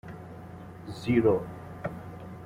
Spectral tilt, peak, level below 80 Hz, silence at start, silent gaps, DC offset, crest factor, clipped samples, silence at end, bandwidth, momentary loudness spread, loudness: -8 dB/octave; -12 dBFS; -58 dBFS; 0.05 s; none; under 0.1%; 20 dB; under 0.1%; 0 s; 15 kHz; 20 LU; -28 LUFS